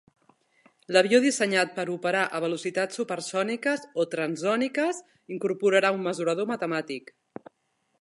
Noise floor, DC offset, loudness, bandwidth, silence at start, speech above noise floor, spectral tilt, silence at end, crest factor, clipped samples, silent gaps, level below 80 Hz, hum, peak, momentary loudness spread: -74 dBFS; under 0.1%; -26 LUFS; 11.5 kHz; 0.9 s; 48 dB; -4 dB/octave; 1 s; 22 dB; under 0.1%; none; -82 dBFS; none; -4 dBFS; 16 LU